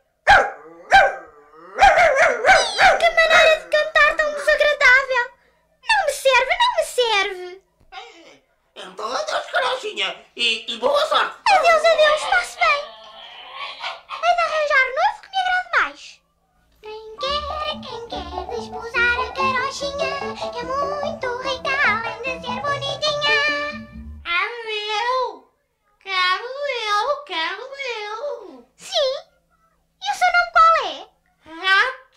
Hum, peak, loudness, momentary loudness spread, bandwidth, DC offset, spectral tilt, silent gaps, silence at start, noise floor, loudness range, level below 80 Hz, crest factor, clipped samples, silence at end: none; -2 dBFS; -18 LUFS; 17 LU; 15.5 kHz; under 0.1%; -1.5 dB/octave; none; 0.25 s; -66 dBFS; 10 LU; -46 dBFS; 20 dB; under 0.1%; 0.2 s